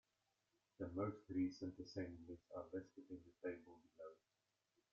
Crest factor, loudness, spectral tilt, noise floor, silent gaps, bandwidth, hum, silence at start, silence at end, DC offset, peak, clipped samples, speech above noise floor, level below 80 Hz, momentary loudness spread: 18 dB; -50 LUFS; -7 dB/octave; -88 dBFS; none; 7 kHz; none; 0.8 s; 0.8 s; under 0.1%; -32 dBFS; under 0.1%; 38 dB; -80 dBFS; 15 LU